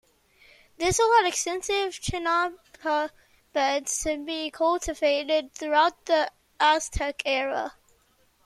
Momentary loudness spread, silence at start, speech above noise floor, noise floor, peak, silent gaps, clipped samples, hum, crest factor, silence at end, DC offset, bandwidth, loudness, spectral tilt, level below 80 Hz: 10 LU; 0.8 s; 39 dB; -64 dBFS; -8 dBFS; none; under 0.1%; none; 18 dB; 0.75 s; under 0.1%; 14 kHz; -25 LUFS; -2.5 dB/octave; -48 dBFS